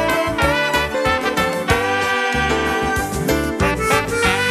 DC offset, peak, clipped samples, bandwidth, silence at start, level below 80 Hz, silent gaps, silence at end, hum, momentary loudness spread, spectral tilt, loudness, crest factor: under 0.1%; -2 dBFS; under 0.1%; 14.5 kHz; 0 s; -32 dBFS; none; 0 s; none; 3 LU; -4 dB/octave; -18 LUFS; 18 dB